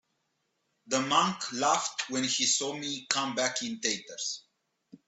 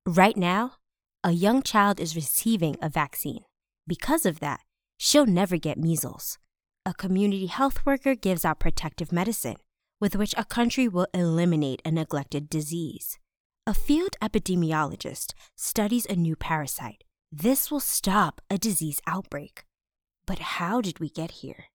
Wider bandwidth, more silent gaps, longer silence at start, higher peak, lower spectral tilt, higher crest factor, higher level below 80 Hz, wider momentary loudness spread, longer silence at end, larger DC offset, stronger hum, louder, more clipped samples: second, 8.4 kHz vs over 20 kHz; second, none vs 13.40-13.50 s; first, 0.85 s vs 0.05 s; about the same, -6 dBFS vs -6 dBFS; second, -1.5 dB/octave vs -4.5 dB/octave; first, 26 dB vs 20 dB; second, -76 dBFS vs -40 dBFS; second, 10 LU vs 13 LU; about the same, 0.1 s vs 0.1 s; neither; neither; second, -29 LUFS vs -26 LUFS; neither